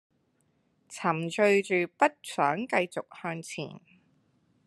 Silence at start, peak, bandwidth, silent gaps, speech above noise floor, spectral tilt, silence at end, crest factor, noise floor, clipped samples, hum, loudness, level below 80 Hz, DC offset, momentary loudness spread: 0.9 s; -6 dBFS; 12.5 kHz; none; 43 dB; -5 dB/octave; 0.9 s; 24 dB; -71 dBFS; under 0.1%; none; -28 LUFS; -82 dBFS; under 0.1%; 14 LU